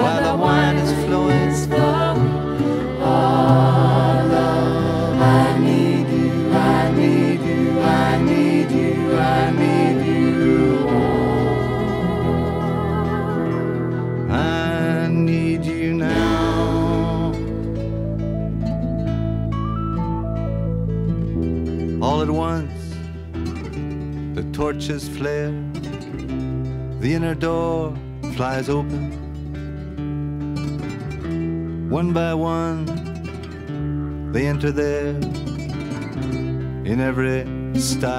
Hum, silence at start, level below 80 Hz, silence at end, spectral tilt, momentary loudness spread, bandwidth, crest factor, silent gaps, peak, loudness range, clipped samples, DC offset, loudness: none; 0 s; -34 dBFS; 0 s; -7 dB/octave; 12 LU; 14 kHz; 18 dB; none; -2 dBFS; 9 LU; under 0.1%; under 0.1%; -20 LUFS